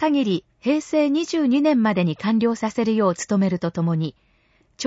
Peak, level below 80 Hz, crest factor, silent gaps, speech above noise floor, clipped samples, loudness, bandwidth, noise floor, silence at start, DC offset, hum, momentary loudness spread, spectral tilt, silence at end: -8 dBFS; -60 dBFS; 14 dB; none; 41 dB; under 0.1%; -21 LUFS; 8 kHz; -61 dBFS; 0 s; under 0.1%; none; 5 LU; -6 dB/octave; 0 s